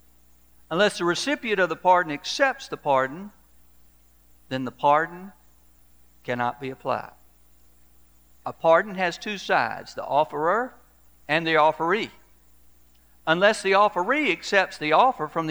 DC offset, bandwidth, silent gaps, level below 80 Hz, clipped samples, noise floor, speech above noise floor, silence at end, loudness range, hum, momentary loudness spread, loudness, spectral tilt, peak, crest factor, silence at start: 0.1%; over 20 kHz; none; -62 dBFS; under 0.1%; -58 dBFS; 35 dB; 0 s; 6 LU; 60 Hz at -60 dBFS; 13 LU; -23 LUFS; -4 dB/octave; -4 dBFS; 22 dB; 0.7 s